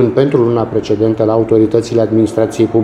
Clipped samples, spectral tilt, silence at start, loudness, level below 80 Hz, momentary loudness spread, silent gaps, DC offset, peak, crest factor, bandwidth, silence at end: under 0.1%; -8 dB/octave; 0 s; -13 LUFS; -44 dBFS; 3 LU; none; under 0.1%; 0 dBFS; 12 dB; 11 kHz; 0 s